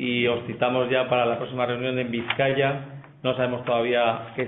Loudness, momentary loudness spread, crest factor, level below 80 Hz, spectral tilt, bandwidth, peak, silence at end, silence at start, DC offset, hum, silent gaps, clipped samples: -24 LUFS; 6 LU; 18 dB; -62 dBFS; -10 dB/octave; 4.1 kHz; -8 dBFS; 0 s; 0 s; under 0.1%; none; none; under 0.1%